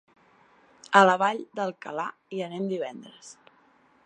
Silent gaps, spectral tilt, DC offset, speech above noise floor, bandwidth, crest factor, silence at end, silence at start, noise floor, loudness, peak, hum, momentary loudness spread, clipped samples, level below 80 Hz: none; -4.5 dB/octave; under 0.1%; 36 dB; 10 kHz; 24 dB; 0.75 s; 0.9 s; -61 dBFS; -26 LUFS; -4 dBFS; none; 22 LU; under 0.1%; -82 dBFS